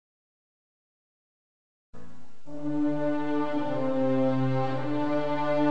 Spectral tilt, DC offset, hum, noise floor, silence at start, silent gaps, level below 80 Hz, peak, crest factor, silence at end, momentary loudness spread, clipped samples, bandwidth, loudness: -8.5 dB/octave; 3%; none; -51 dBFS; 1.9 s; none; -60 dBFS; -12 dBFS; 16 dB; 0 s; 4 LU; under 0.1%; 8 kHz; -28 LUFS